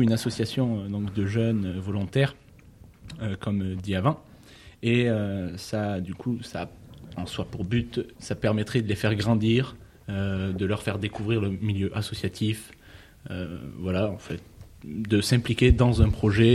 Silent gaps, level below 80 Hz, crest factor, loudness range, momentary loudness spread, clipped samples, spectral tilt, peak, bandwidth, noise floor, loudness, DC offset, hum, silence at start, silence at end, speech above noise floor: none; -40 dBFS; 20 dB; 4 LU; 14 LU; under 0.1%; -6.5 dB/octave; -6 dBFS; 13 kHz; -51 dBFS; -27 LUFS; under 0.1%; none; 0 s; 0 s; 25 dB